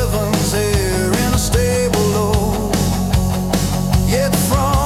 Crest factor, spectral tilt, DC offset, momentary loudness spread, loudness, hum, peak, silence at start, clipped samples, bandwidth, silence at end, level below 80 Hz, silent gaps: 12 dB; -5 dB/octave; under 0.1%; 2 LU; -16 LUFS; none; -4 dBFS; 0 s; under 0.1%; 17.5 kHz; 0 s; -24 dBFS; none